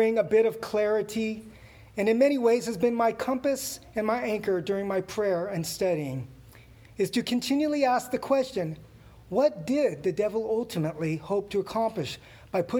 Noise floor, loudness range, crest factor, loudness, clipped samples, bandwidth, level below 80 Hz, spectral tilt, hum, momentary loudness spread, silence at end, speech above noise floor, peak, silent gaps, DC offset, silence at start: -51 dBFS; 3 LU; 16 dB; -27 LUFS; under 0.1%; over 20 kHz; -60 dBFS; -5.5 dB/octave; none; 10 LU; 0 s; 24 dB; -12 dBFS; none; under 0.1%; 0 s